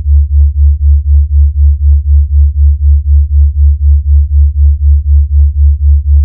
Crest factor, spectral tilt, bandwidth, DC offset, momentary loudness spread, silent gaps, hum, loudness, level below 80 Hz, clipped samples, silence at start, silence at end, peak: 6 dB; -15.5 dB/octave; 0.2 kHz; under 0.1%; 2 LU; none; none; -9 LUFS; -6 dBFS; 0.7%; 0 s; 0 s; 0 dBFS